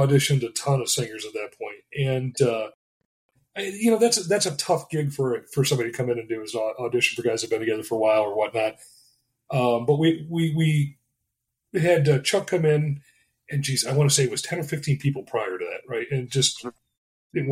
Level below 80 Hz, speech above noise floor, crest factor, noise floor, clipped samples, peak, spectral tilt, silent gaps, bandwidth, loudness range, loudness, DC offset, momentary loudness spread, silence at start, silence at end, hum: -62 dBFS; 57 dB; 18 dB; -80 dBFS; under 0.1%; -6 dBFS; -4.5 dB/octave; 2.74-3.29 s, 16.97-17.30 s; 15.5 kHz; 3 LU; -24 LUFS; under 0.1%; 11 LU; 0 s; 0 s; none